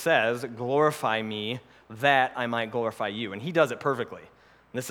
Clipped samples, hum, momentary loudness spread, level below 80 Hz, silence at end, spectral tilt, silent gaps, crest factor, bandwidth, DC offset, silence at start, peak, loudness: under 0.1%; none; 14 LU; -70 dBFS; 0 s; -4.5 dB/octave; none; 22 dB; 19 kHz; under 0.1%; 0 s; -6 dBFS; -27 LUFS